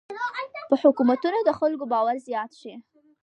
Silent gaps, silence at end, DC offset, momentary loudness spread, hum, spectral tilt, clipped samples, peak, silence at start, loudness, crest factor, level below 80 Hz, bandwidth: none; 0.4 s; under 0.1%; 15 LU; none; -6 dB/octave; under 0.1%; -6 dBFS; 0.1 s; -24 LUFS; 20 dB; -72 dBFS; 9 kHz